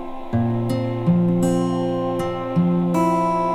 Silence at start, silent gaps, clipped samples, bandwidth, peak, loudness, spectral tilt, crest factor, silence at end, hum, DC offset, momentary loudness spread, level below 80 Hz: 0 s; none; under 0.1%; 12.5 kHz; -6 dBFS; -21 LUFS; -8 dB/octave; 12 dB; 0 s; none; under 0.1%; 5 LU; -46 dBFS